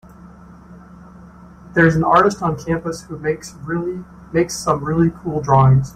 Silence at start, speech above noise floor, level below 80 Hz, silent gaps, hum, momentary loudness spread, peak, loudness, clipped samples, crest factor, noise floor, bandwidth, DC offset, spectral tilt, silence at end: 0.25 s; 24 dB; -42 dBFS; none; none; 13 LU; -2 dBFS; -18 LUFS; under 0.1%; 16 dB; -41 dBFS; 13.5 kHz; under 0.1%; -6.5 dB/octave; 0.05 s